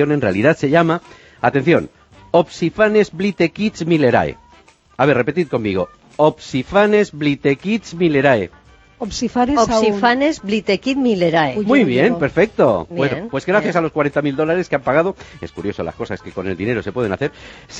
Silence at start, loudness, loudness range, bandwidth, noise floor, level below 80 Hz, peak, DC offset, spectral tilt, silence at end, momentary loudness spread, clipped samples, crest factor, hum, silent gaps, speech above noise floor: 0 s; -17 LUFS; 4 LU; 8.4 kHz; -49 dBFS; -46 dBFS; 0 dBFS; under 0.1%; -6 dB/octave; 0 s; 10 LU; under 0.1%; 16 dB; none; none; 32 dB